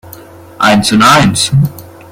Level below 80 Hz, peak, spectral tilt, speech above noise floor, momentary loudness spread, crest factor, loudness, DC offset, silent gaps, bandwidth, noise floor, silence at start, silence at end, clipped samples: -38 dBFS; 0 dBFS; -4.5 dB/octave; 25 dB; 7 LU; 10 dB; -8 LUFS; under 0.1%; none; 16.5 kHz; -33 dBFS; 0.05 s; 0.3 s; 0.2%